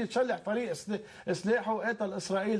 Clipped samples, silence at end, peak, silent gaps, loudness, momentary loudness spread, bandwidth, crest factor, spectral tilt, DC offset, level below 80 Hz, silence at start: under 0.1%; 0 s; -18 dBFS; none; -32 LUFS; 7 LU; 11 kHz; 14 dB; -5 dB/octave; under 0.1%; -72 dBFS; 0 s